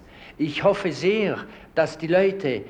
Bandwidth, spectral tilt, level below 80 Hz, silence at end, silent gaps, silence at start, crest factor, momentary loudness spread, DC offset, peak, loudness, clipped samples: 9.6 kHz; -6 dB/octave; -56 dBFS; 0 s; none; 0.15 s; 18 dB; 8 LU; under 0.1%; -6 dBFS; -23 LUFS; under 0.1%